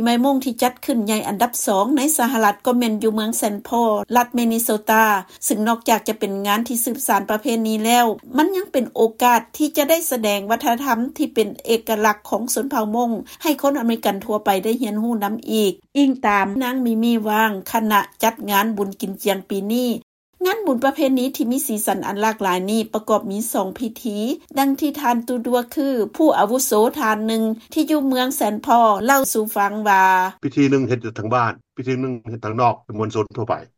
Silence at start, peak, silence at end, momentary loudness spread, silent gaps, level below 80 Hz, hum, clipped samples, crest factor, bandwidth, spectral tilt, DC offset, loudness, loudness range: 0 s; -2 dBFS; 0.15 s; 7 LU; 20.03-20.33 s; -60 dBFS; none; under 0.1%; 16 dB; 16.5 kHz; -4 dB/octave; under 0.1%; -19 LUFS; 4 LU